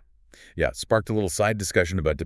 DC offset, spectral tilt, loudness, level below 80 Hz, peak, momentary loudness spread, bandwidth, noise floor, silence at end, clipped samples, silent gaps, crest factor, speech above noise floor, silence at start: under 0.1%; -5 dB/octave; -24 LUFS; -42 dBFS; -6 dBFS; 5 LU; 12 kHz; -53 dBFS; 0 s; under 0.1%; none; 20 dB; 29 dB; 0.55 s